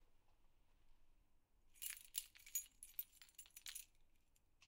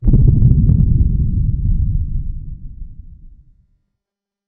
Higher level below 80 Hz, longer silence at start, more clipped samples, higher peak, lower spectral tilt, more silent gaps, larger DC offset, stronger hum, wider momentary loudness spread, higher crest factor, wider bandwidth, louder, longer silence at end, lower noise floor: second, -76 dBFS vs -18 dBFS; about the same, 0 s vs 0 s; neither; second, -24 dBFS vs 0 dBFS; second, 2.5 dB/octave vs -14.5 dB/octave; neither; neither; neither; second, 11 LU vs 23 LU; first, 34 dB vs 14 dB; first, 17.5 kHz vs 1 kHz; second, -51 LUFS vs -16 LUFS; second, 0 s vs 1.2 s; second, -75 dBFS vs -84 dBFS